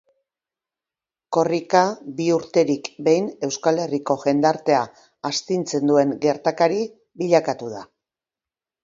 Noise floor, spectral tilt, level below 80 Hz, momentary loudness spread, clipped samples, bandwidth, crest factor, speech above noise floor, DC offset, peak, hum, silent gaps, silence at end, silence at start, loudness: under -90 dBFS; -5 dB/octave; -68 dBFS; 10 LU; under 0.1%; 7.8 kHz; 22 dB; over 70 dB; under 0.1%; 0 dBFS; none; none; 1 s; 1.3 s; -21 LUFS